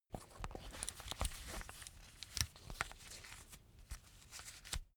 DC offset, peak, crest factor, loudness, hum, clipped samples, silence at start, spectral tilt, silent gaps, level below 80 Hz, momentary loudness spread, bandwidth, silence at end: under 0.1%; -14 dBFS; 36 dB; -47 LUFS; none; under 0.1%; 0.1 s; -2 dB/octave; none; -54 dBFS; 14 LU; over 20 kHz; 0.1 s